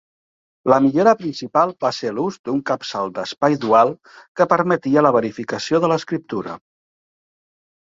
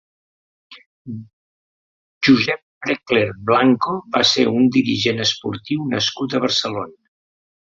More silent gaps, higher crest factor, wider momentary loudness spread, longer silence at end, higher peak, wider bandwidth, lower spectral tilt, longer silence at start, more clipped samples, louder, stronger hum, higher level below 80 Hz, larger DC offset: second, 2.39-2.44 s, 4.28-4.35 s vs 0.86-1.05 s, 1.33-2.21 s, 2.62-2.81 s; about the same, 20 dB vs 18 dB; about the same, 11 LU vs 13 LU; first, 1.25 s vs 0.85 s; about the same, 0 dBFS vs -2 dBFS; about the same, 7.8 kHz vs 7.8 kHz; first, -6 dB/octave vs -4.5 dB/octave; about the same, 0.65 s vs 0.7 s; neither; about the same, -19 LUFS vs -18 LUFS; neither; about the same, -62 dBFS vs -58 dBFS; neither